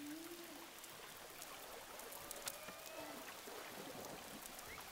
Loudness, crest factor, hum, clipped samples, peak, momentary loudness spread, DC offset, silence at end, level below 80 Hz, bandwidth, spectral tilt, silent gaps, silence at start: -51 LUFS; 32 dB; none; under 0.1%; -20 dBFS; 6 LU; under 0.1%; 0 s; -74 dBFS; 16 kHz; -2 dB/octave; none; 0 s